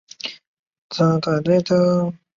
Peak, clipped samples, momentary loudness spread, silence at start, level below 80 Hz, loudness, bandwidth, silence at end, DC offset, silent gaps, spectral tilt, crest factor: -4 dBFS; under 0.1%; 14 LU; 0.25 s; -58 dBFS; -18 LUFS; 7.4 kHz; 0.2 s; under 0.1%; 0.47-0.71 s, 0.78-0.90 s; -7 dB/octave; 16 dB